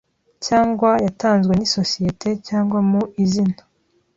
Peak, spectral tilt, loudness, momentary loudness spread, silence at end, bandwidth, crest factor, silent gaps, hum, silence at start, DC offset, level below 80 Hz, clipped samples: -2 dBFS; -6 dB/octave; -19 LUFS; 6 LU; 0.6 s; 7.8 kHz; 16 dB; none; none; 0.4 s; under 0.1%; -50 dBFS; under 0.1%